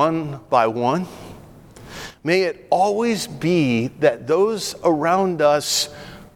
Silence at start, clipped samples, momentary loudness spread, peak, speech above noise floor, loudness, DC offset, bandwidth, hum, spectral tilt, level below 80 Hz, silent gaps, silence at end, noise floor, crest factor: 0 s; under 0.1%; 16 LU; -4 dBFS; 23 dB; -20 LUFS; under 0.1%; 18.5 kHz; none; -4.5 dB/octave; -54 dBFS; none; 0.1 s; -43 dBFS; 16 dB